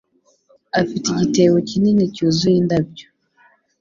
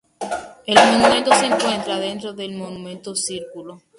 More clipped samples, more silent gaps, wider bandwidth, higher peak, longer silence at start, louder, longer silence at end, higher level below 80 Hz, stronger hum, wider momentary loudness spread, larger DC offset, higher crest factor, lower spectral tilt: neither; neither; second, 7.6 kHz vs 11.5 kHz; about the same, -2 dBFS vs 0 dBFS; first, 0.75 s vs 0.2 s; about the same, -17 LUFS vs -18 LUFS; first, 0.8 s vs 0.2 s; about the same, -52 dBFS vs -56 dBFS; neither; second, 6 LU vs 18 LU; neither; about the same, 16 dB vs 20 dB; first, -6 dB/octave vs -2.5 dB/octave